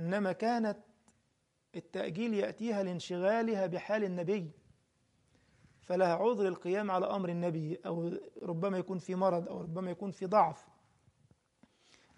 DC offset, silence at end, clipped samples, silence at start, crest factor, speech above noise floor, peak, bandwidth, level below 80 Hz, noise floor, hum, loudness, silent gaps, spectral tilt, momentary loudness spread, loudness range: under 0.1%; 1.55 s; under 0.1%; 0 s; 20 dB; 44 dB; -14 dBFS; 11 kHz; -78 dBFS; -78 dBFS; none; -34 LUFS; none; -7 dB/octave; 10 LU; 2 LU